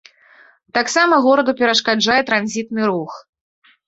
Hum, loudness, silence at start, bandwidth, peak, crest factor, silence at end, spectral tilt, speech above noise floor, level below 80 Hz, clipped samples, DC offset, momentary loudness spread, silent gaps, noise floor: none; -16 LUFS; 0.75 s; 8.2 kHz; 0 dBFS; 18 dB; 0.7 s; -3 dB/octave; 33 dB; -60 dBFS; under 0.1%; under 0.1%; 10 LU; none; -50 dBFS